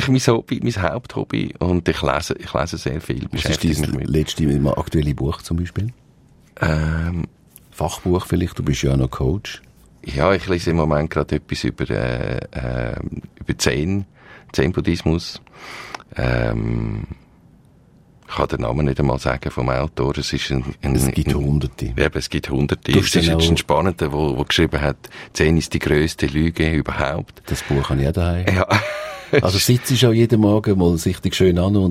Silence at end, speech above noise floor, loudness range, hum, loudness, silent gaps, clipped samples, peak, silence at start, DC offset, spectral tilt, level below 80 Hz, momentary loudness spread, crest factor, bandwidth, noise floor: 0 s; 32 dB; 6 LU; none; -20 LUFS; none; under 0.1%; -2 dBFS; 0 s; under 0.1%; -5.5 dB/octave; -32 dBFS; 11 LU; 18 dB; 16 kHz; -51 dBFS